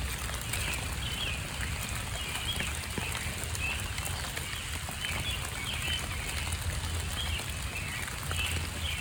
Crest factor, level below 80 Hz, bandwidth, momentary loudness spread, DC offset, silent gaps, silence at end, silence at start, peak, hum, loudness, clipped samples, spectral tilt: 18 dB; -42 dBFS; over 20 kHz; 3 LU; under 0.1%; none; 0 s; 0 s; -16 dBFS; none; -33 LUFS; under 0.1%; -2.5 dB/octave